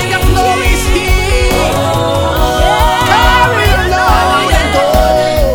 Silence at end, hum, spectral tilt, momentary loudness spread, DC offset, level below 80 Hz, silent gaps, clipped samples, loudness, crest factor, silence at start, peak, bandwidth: 0 s; none; -4.5 dB/octave; 4 LU; under 0.1%; -16 dBFS; none; 0.1%; -10 LUFS; 10 dB; 0 s; 0 dBFS; over 20 kHz